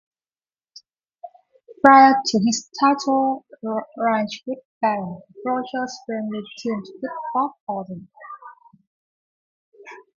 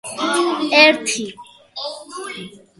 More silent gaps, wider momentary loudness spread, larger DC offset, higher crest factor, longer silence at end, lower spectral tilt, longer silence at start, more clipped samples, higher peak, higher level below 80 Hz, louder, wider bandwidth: first, 4.65-4.81 s, 7.60-7.67 s, 8.87-9.72 s vs none; about the same, 19 LU vs 20 LU; neither; about the same, 22 dB vs 20 dB; about the same, 0.2 s vs 0.2 s; first, -4 dB/octave vs -1.5 dB/octave; first, 1.25 s vs 0.05 s; neither; about the same, 0 dBFS vs 0 dBFS; about the same, -66 dBFS vs -66 dBFS; second, -20 LUFS vs -15 LUFS; second, 7.6 kHz vs 12 kHz